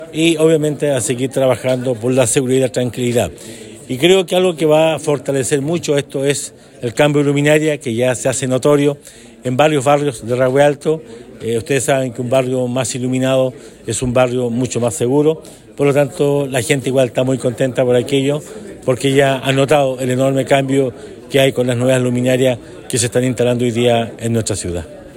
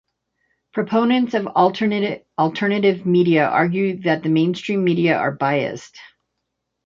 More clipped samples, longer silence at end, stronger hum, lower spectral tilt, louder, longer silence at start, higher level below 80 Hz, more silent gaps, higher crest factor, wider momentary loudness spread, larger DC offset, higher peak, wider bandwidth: neither; second, 0 s vs 0.8 s; neither; second, -5 dB/octave vs -7 dB/octave; first, -15 LUFS vs -19 LUFS; second, 0 s vs 0.75 s; first, -50 dBFS vs -64 dBFS; neither; about the same, 14 dB vs 16 dB; about the same, 9 LU vs 7 LU; neither; about the same, 0 dBFS vs -2 dBFS; first, 16.5 kHz vs 7.6 kHz